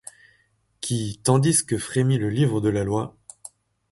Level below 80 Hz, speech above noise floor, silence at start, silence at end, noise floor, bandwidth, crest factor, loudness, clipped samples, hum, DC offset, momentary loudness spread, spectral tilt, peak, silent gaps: -52 dBFS; 43 dB; 0.8 s; 0.8 s; -65 dBFS; 12 kHz; 18 dB; -23 LUFS; under 0.1%; none; under 0.1%; 22 LU; -5.5 dB/octave; -6 dBFS; none